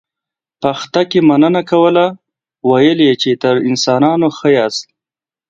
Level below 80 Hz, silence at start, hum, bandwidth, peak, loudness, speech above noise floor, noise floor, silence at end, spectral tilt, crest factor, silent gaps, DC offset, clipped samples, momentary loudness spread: -58 dBFS; 0.6 s; none; 7.8 kHz; 0 dBFS; -12 LUFS; 78 dB; -89 dBFS; 0.65 s; -5.5 dB/octave; 12 dB; none; under 0.1%; under 0.1%; 9 LU